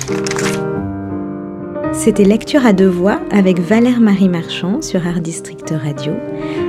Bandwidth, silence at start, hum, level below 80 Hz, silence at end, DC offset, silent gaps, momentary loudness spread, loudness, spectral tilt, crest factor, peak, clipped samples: 13.5 kHz; 0 s; none; -44 dBFS; 0 s; under 0.1%; none; 12 LU; -15 LUFS; -6 dB/octave; 14 dB; 0 dBFS; under 0.1%